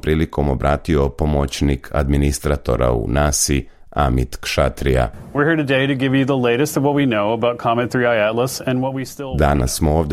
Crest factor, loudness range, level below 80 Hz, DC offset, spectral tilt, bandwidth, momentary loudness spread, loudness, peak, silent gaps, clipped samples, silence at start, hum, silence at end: 14 dB; 1 LU; -28 dBFS; under 0.1%; -5.5 dB/octave; 16 kHz; 5 LU; -18 LUFS; -2 dBFS; none; under 0.1%; 0.05 s; none; 0 s